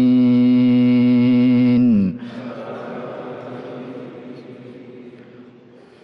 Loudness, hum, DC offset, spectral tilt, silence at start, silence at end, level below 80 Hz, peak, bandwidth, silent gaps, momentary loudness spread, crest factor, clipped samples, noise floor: -15 LUFS; none; under 0.1%; -9.5 dB/octave; 0 s; 0.6 s; -60 dBFS; -8 dBFS; 5.4 kHz; none; 23 LU; 8 dB; under 0.1%; -45 dBFS